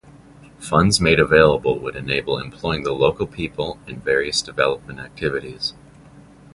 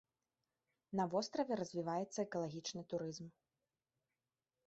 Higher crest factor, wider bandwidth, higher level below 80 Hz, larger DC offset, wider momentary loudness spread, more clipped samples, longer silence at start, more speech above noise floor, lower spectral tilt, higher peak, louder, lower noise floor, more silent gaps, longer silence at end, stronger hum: about the same, 20 dB vs 20 dB; first, 11.5 kHz vs 8 kHz; first, -42 dBFS vs -82 dBFS; neither; first, 14 LU vs 8 LU; neither; second, 0.4 s vs 0.9 s; second, 26 dB vs over 48 dB; about the same, -4.5 dB/octave vs -5 dB/octave; first, 0 dBFS vs -24 dBFS; first, -20 LUFS vs -42 LUFS; second, -46 dBFS vs under -90 dBFS; neither; second, 0.35 s vs 1.35 s; neither